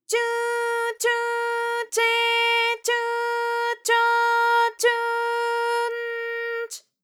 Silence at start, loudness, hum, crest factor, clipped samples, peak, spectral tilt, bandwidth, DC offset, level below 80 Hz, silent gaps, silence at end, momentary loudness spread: 0.1 s; -22 LUFS; none; 14 dB; under 0.1%; -8 dBFS; 4 dB/octave; 19 kHz; under 0.1%; under -90 dBFS; none; 0.25 s; 9 LU